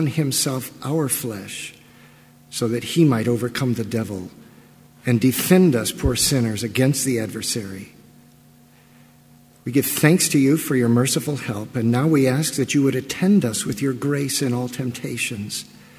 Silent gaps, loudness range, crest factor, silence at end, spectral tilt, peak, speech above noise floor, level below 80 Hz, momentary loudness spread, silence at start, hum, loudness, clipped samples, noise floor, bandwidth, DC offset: none; 5 LU; 20 dB; 0.35 s; -5 dB/octave; 0 dBFS; 31 dB; -46 dBFS; 13 LU; 0 s; none; -20 LUFS; under 0.1%; -51 dBFS; 16 kHz; under 0.1%